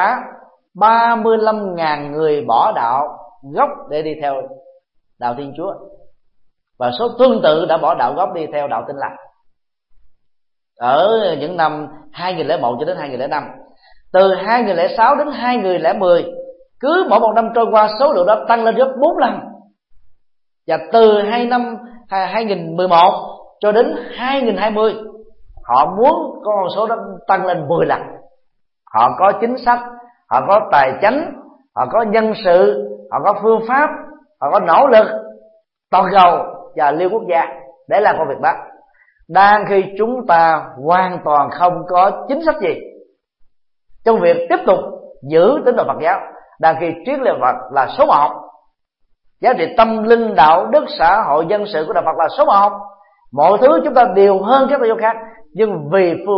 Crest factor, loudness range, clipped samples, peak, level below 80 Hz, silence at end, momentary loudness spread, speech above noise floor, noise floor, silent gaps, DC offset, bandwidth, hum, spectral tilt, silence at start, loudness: 16 dB; 5 LU; under 0.1%; 0 dBFS; -52 dBFS; 0 s; 12 LU; 52 dB; -66 dBFS; none; under 0.1%; 5.8 kHz; none; -9 dB/octave; 0 s; -14 LUFS